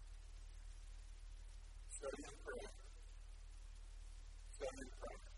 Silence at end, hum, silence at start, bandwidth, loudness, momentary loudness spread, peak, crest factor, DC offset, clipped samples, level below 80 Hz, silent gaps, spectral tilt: 0 s; none; 0 s; 11.5 kHz; -56 LUFS; 11 LU; -34 dBFS; 18 dB; under 0.1%; under 0.1%; -56 dBFS; none; -4 dB/octave